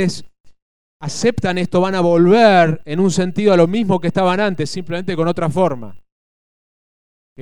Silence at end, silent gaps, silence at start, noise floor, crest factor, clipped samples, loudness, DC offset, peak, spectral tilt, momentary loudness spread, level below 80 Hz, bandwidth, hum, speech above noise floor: 0 s; 0.40-0.44 s, 0.62-1.00 s, 6.12-7.36 s; 0 s; under -90 dBFS; 16 dB; under 0.1%; -16 LUFS; 3%; 0 dBFS; -6 dB/octave; 12 LU; -50 dBFS; 11.5 kHz; none; over 75 dB